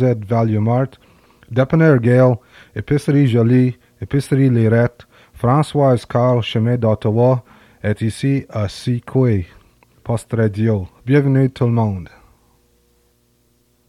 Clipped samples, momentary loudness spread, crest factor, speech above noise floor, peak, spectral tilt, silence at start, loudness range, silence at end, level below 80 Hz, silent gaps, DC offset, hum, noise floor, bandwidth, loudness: under 0.1%; 11 LU; 16 dB; 44 dB; 0 dBFS; -8.5 dB/octave; 0 s; 4 LU; 1.8 s; -50 dBFS; none; under 0.1%; none; -59 dBFS; 12 kHz; -17 LUFS